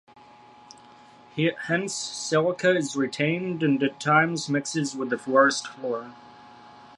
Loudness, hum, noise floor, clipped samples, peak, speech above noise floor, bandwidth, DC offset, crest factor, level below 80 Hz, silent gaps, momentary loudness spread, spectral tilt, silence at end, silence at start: -25 LUFS; none; -51 dBFS; under 0.1%; -6 dBFS; 26 dB; 11.5 kHz; under 0.1%; 20 dB; -72 dBFS; none; 11 LU; -4.5 dB/octave; 0.1 s; 1.35 s